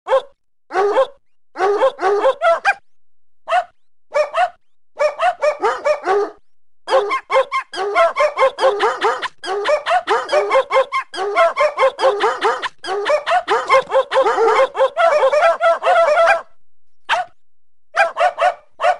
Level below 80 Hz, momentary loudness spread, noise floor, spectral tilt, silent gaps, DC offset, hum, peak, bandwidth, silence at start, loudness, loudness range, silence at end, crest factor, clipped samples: -62 dBFS; 8 LU; -66 dBFS; -1.5 dB/octave; none; under 0.1%; none; 0 dBFS; 11.5 kHz; 0.05 s; -17 LUFS; 5 LU; 0 s; 16 dB; under 0.1%